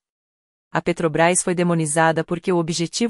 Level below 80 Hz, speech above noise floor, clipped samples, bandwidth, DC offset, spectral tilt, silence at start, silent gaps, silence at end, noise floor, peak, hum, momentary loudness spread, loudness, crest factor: -56 dBFS; over 70 dB; under 0.1%; 11.5 kHz; under 0.1%; -4.5 dB/octave; 0.75 s; none; 0 s; under -90 dBFS; -4 dBFS; none; 6 LU; -20 LUFS; 18 dB